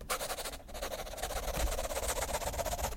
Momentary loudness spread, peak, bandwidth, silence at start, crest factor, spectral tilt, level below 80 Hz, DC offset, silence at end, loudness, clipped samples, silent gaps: 6 LU; -18 dBFS; 16.5 kHz; 0 s; 18 dB; -2.5 dB/octave; -42 dBFS; under 0.1%; 0 s; -37 LUFS; under 0.1%; none